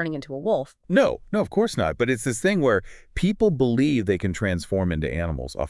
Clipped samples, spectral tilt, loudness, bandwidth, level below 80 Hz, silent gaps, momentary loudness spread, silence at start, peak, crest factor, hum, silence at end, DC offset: under 0.1%; -6 dB/octave; -23 LUFS; 12 kHz; -42 dBFS; none; 6 LU; 0 s; -6 dBFS; 18 dB; none; 0 s; under 0.1%